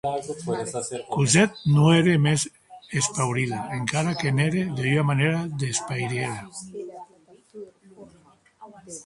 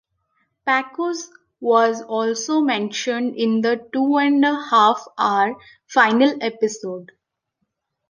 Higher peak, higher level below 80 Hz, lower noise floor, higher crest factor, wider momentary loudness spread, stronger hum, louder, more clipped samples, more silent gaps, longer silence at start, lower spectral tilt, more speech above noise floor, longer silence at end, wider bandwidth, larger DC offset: about the same, -4 dBFS vs -2 dBFS; first, -58 dBFS vs -74 dBFS; second, -57 dBFS vs -76 dBFS; about the same, 20 dB vs 18 dB; first, 19 LU vs 12 LU; neither; second, -23 LUFS vs -19 LUFS; neither; neither; second, 0.05 s vs 0.65 s; first, -5 dB/octave vs -3.5 dB/octave; second, 34 dB vs 57 dB; second, 0.05 s vs 1.05 s; first, 11.5 kHz vs 10 kHz; neither